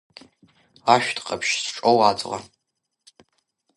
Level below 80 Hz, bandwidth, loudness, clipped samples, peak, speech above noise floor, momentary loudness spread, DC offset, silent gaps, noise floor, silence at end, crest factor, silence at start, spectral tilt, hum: -64 dBFS; 11.5 kHz; -21 LUFS; under 0.1%; 0 dBFS; 58 dB; 11 LU; under 0.1%; none; -79 dBFS; 1.35 s; 24 dB; 0.85 s; -3 dB/octave; none